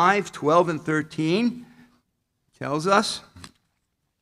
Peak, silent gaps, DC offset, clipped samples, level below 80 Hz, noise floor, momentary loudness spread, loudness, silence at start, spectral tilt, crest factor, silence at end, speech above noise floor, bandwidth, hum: -4 dBFS; none; under 0.1%; under 0.1%; -66 dBFS; -75 dBFS; 12 LU; -23 LUFS; 0 s; -5 dB/octave; 20 dB; 0.75 s; 53 dB; 14.5 kHz; none